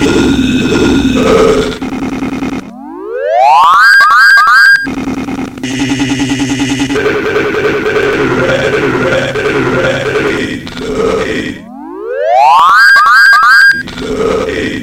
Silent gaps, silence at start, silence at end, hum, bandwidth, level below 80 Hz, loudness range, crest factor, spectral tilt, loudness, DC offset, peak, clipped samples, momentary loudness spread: none; 0 s; 0 s; none; 17 kHz; -32 dBFS; 6 LU; 8 dB; -4.5 dB/octave; -8 LUFS; under 0.1%; 0 dBFS; 2%; 15 LU